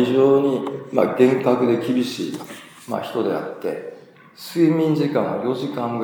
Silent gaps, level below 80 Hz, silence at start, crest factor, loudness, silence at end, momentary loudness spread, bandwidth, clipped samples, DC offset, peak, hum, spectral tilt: none; -76 dBFS; 0 s; 18 dB; -20 LUFS; 0 s; 15 LU; over 20 kHz; under 0.1%; under 0.1%; -2 dBFS; none; -7 dB/octave